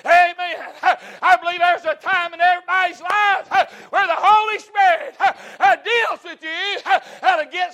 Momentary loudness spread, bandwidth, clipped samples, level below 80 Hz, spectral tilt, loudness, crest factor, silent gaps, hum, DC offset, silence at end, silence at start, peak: 8 LU; 13 kHz; under 0.1%; -70 dBFS; -1 dB/octave; -18 LUFS; 14 dB; none; none; under 0.1%; 0 s; 0.05 s; -4 dBFS